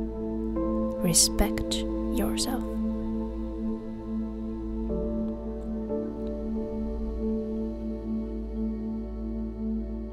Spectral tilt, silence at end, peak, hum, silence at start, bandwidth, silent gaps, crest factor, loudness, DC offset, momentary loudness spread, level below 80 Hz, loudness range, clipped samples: -4 dB/octave; 0 s; -8 dBFS; none; 0 s; 16 kHz; none; 22 dB; -30 LUFS; under 0.1%; 8 LU; -36 dBFS; 6 LU; under 0.1%